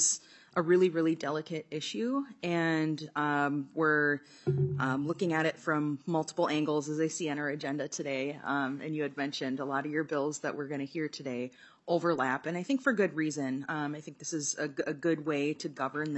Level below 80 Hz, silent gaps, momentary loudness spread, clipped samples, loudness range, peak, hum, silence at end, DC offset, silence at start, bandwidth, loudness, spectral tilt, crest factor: -80 dBFS; none; 8 LU; under 0.1%; 3 LU; -14 dBFS; none; 0 s; under 0.1%; 0 s; 8.4 kHz; -32 LUFS; -4.5 dB/octave; 18 dB